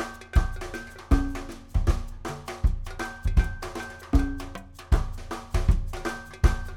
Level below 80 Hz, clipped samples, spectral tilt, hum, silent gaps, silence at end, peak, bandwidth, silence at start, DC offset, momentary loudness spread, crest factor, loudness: -28 dBFS; under 0.1%; -6.5 dB/octave; none; none; 0 s; -6 dBFS; 14.5 kHz; 0 s; under 0.1%; 11 LU; 20 dB; -29 LUFS